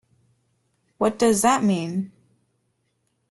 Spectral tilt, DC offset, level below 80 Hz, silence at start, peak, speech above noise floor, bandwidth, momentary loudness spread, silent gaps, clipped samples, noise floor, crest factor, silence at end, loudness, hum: -4.5 dB/octave; under 0.1%; -62 dBFS; 1 s; -6 dBFS; 51 dB; 12.5 kHz; 12 LU; none; under 0.1%; -72 dBFS; 18 dB; 1.25 s; -21 LUFS; none